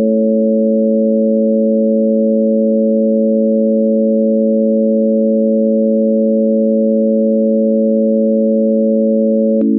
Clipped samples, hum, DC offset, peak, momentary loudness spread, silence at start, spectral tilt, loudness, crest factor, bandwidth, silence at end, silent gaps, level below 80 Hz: under 0.1%; none; under 0.1%; -4 dBFS; 0 LU; 0 s; -17.5 dB/octave; -13 LUFS; 8 dB; 0.7 kHz; 0 s; none; -74 dBFS